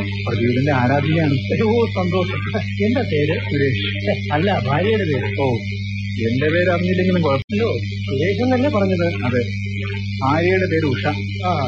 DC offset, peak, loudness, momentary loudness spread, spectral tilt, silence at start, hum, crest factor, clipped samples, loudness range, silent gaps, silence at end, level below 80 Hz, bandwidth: under 0.1%; -4 dBFS; -19 LUFS; 6 LU; -7.5 dB/octave; 0 s; none; 16 dB; under 0.1%; 1 LU; 7.44-7.48 s; 0 s; -44 dBFS; 7.2 kHz